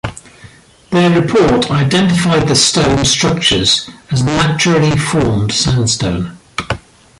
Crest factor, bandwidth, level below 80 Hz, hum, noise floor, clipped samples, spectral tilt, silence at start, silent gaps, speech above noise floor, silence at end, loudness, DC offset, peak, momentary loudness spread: 14 dB; 11.5 kHz; -34 dBFS; none; -40 dBFS; under 0.1%; -4 dB/octave; 0.05 s; none; 28 dB; 0.4 s; -12 LUFS; under 0.1%; 0 dBFS; 11 LU